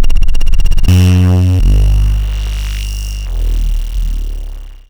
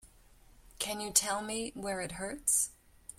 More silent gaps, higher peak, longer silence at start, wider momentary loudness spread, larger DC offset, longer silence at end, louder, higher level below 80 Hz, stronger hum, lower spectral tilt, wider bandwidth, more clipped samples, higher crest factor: neither; first, 0 dBFS vs -10 dBFS; about the same, 0 s vs 0.05 s; about the same, 12 LU vs 10 LU; neither; about the same, 0.15 s vs 0.05 s; first, -14 LUFS vs -32 LUFS; first, -12 dBFS vs -60 dBFS; neither; first, -6.5 dB/octave vs -1 dB/octave; about the same, 15 kHz vs 16.5 kHz; first, 1% vs under 0.1%; second, 8 dB vs 26 dB